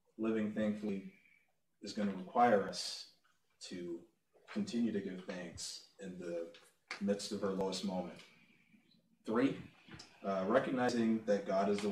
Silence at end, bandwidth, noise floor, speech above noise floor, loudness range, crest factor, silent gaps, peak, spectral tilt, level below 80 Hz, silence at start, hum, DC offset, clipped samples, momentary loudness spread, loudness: 0 s; 13.5 kHz; -75 dBFS; 39 dB; 6 LU; 20 dB; none; -18 dBFS; -5 dB/octave; -76 dBFS; 0.2 s; none; under 0.1%; under 0.1%; 17 LU; -37 LUFS